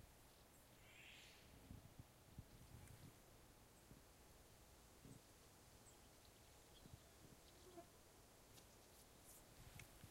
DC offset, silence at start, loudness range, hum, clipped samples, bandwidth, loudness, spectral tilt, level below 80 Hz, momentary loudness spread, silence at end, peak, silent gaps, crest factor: under 0.1%; 0 s; 2 LU; none; under 0.1%; 16 kHz; -65 LUFS; -3.5 dB/octave; -74 dBFS; 5 LU; 0 s; -44 dBFS; none; 20 dB